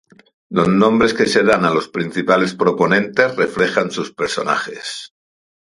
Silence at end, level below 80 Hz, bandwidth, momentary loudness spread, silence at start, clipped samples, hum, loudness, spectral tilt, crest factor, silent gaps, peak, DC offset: 0.55 s; -52 dBFS; 11.5 kHz; 9 LU; 0.5 s; under 0.1%; none; -16 LUFS; -5 dB/octave; 16 dB; none; 0 dBFS; under 0.1%